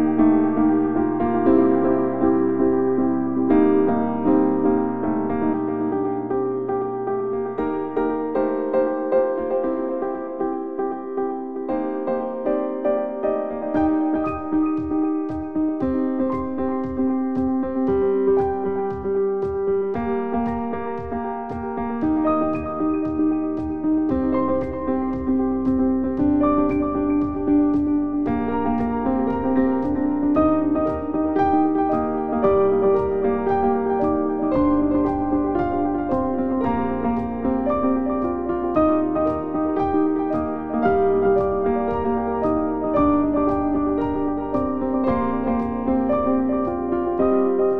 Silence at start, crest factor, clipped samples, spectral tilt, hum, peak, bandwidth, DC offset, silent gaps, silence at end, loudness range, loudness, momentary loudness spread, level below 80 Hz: 0 s; 16 dB; under 0.1%; -10.5 dB/octave; none; -6 dBFS; 4 kHz; 0.9%; none; 0 s; 4 LU; -21 LUFS; 6 LU; -44 dBFS